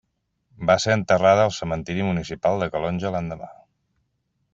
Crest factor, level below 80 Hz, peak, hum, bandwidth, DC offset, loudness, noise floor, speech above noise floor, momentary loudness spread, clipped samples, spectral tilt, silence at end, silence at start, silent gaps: 20 dB; -52 dBFS; -4 dBFS; none; 8 kHz; under 0.1%; -22 LUFS; -73 dBFS; 51 dB; 12 LU; under 0.1%; -5.5 dB/octave; 1 s; 0.6 s; none